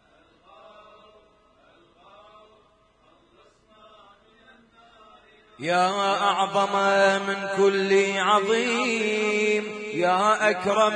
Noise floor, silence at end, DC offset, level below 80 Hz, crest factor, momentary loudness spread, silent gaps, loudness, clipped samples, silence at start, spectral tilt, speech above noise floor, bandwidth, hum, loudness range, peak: -60 dBFS; 0 s; under 0.1%; -70 dBFS; 18 dB; 6 LU; none; -22 LUFS; under 0.1%; 5.6 s; -3.5 dB/octave; 38 dB; 10 kHz; none; 8 LU; -6 dBFS